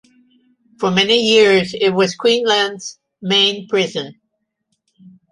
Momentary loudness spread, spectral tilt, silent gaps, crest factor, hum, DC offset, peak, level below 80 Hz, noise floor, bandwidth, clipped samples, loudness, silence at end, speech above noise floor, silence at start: 17 LU; -3.5 dB/octave; none; 16 dB; none; under 0.1%; -2 dBFS; -62 dBFS; -73 dBFS; 11.5 kHz; under 0.1%; -15 LUFS; 0.25 s; 57 dB; 0.8 s